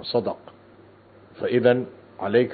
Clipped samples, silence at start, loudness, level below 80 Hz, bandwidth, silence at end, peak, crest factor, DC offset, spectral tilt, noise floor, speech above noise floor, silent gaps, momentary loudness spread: under 0.1%; 0 s; -23 LUFS; -68 dBFS; 4.7 kHz; 0 s; -4 dBFS; 20 dB; under 0.1%; -10.5 dB/octave; -51 dBFS; 29 dB; none; 16 LU